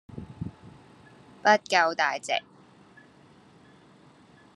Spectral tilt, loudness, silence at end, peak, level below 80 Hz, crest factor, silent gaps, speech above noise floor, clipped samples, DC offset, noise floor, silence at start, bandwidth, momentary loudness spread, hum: -3 dB/octave; -25 LUFS; 2.15 s; -6 dBFS; -64 dBFS; 26 dB; none; 31 dB; under 0.1%; under 0.1%; -56 dBFS; 0.1 s; 12 kHz; 19 LU; none